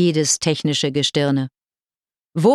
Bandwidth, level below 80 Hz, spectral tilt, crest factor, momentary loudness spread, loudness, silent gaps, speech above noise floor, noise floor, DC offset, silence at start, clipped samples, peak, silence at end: 13.5 kHz; -60 dBFS; -4.5 dB/octave; 16 dB; 9 LU; -19 LUFS; none; over 71 dB; under -90 dBFS; under 0.1%; 0 s; under 0.1%; -4 dBFS; 0 s